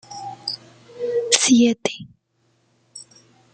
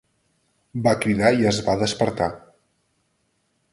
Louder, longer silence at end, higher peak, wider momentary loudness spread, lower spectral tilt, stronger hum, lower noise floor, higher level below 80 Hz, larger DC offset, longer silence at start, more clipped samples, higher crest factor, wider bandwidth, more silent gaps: about the same, -19 LUFS vs -21 LUFS; second, 0.5 s vs 1.35 s; first, 0 dBFS vs -4 dBFS; first, 26 LU vs 10 LU; second, -2 dB/octave vs -5 dB/octave; neither; second, -65 dBFS vs -70 dBFS; second, -66 dBFS vs -50 dBFS; neither; second, 0.1 s vs 0.75 s; neither; about the same, 24 dB vs 20 dB; second, 9.4 kHz vs 11.5 kHz; neither